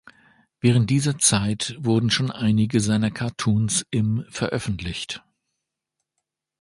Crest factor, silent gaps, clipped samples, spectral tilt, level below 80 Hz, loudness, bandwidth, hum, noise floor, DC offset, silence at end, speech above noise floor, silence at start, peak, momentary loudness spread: 18 dB; none; under 0.1%; -4.5 dB/octave; -48 dBFS; -22 LUFS; 11.5 kHz; none; -82 dBFS; under 0.1%; 1.45 s; 60 dB; 0.65 s; -4 dBFS; 10 LU